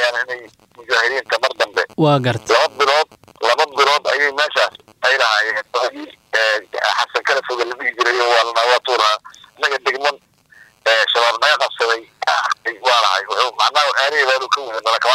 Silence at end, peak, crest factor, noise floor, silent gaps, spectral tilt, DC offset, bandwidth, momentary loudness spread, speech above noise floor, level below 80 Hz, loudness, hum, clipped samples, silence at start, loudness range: 0 s; -2 dBFS; 16 dB; -49 dBFS; none; -3 dB/octave; under 0.1%; 16 kHz; 7 LU; 32 dB; -68 dBFS; -16 LUFS; none; under 0.1%; 0 s; 2 LU